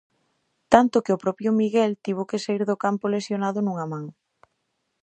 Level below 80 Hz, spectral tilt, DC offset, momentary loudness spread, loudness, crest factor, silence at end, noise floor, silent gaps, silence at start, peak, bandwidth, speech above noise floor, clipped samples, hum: -60 dBFS; -6.5 dB/octave; under 0.1%; 11 LU; -23 LUFS; 24 dB; 0.9 s; -75 dBFS; none; 0.7 s; 0 dBFS; 9.2 kHz; 53 dB; under 0.1%; none